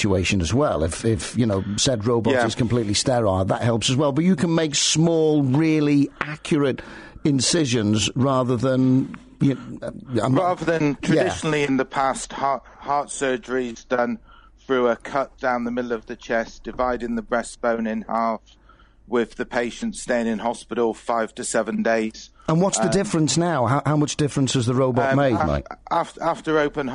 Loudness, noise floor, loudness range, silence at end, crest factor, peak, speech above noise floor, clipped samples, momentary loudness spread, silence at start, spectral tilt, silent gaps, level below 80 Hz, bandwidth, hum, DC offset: -22 LUFS; -50 dBFS; 6 LU; 0 s; 14 dB; -8 dBFS; 29 dB; under 0.1%; 8 LU; 0 s; -5 dB/octave; none; -46 dBFS; 11 kHz; none; under 0.1%